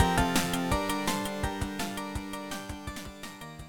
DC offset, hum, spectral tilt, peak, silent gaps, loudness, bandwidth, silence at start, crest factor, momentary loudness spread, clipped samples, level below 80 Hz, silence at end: under 0.1%; none; -4 dB/octave; -8 dBFS; none; -31 LUFS; 17.5 kHz; 0 s; 22 dB; 14 LU; under 0.1%; -42 dBFS; 0 s